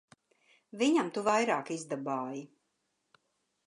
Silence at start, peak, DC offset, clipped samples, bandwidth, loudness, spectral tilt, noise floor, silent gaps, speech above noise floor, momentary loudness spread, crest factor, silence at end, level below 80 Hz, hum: 0.75 s; -14 dBFS; under 0.1%; under 0.1%; 11.5 kHz; -31 LUFS; -4 dB/octave; -80 dBFS; none; 49 dB; 13 LU; 20 dB; 1.2 s; -82 dBFS; none